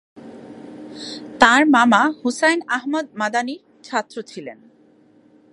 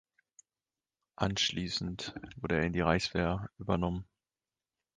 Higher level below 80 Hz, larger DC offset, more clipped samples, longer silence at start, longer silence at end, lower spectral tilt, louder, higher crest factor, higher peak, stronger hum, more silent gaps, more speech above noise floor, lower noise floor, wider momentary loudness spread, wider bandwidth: second, -60 dBFS vs -50 dBFS; neither; neither; second, 0.15 s vs 1.2 s; about the same, 1 s vs 0.95 s; second, -3 dB/octave vs -5 dB/octave; first, -17 LUFS vs -33 LUFS; about the same, 20 dB vs 22 dB; first, 0 dBFS vs -12 dBFS; neither; neither; second, 35 dB vs over 57 dB; second, -53 dBFS vs under -90 dBFS; first, 25 LU vs 11 LU; first, 11.5 kHz vs 9.6 kHz